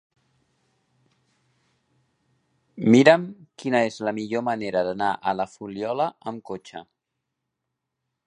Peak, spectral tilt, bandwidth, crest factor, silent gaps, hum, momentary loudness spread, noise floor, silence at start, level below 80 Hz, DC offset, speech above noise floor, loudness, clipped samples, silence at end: 0 dBFS; -6 dB/octave; 10 kHz; 26 dB; none; none; 20 LU; -82 dBFS; 2.75 s; -68 dBFS; under 0.1%; 59 dB; -23 LUFS; under 0.1%; 1.45 s